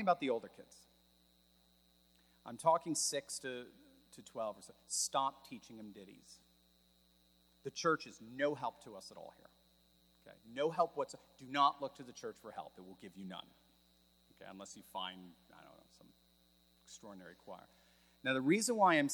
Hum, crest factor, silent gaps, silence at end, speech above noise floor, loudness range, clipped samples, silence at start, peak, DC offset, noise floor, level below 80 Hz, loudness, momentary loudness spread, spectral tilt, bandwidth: none; 24 dB; none; 0 s; 32 dB; 13 LU; under 0.1%; 0 s; -18 dBFS; under 0.1%; -71 dBFS; -80 dBFS; -38 LUFS; 24 LU; -3 dB/octave; 19.5 kHz